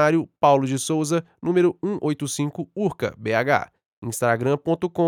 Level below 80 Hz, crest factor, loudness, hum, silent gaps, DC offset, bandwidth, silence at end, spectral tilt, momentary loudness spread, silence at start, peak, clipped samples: -64 dBFS; 18 dB; -23 LUFS; none; 3.86-4.02 s; under 0.1%; 17 kHz; 0 s; -5.5 dB/octave; 8 LU; 0 s; -4 dBFS; under 0.1%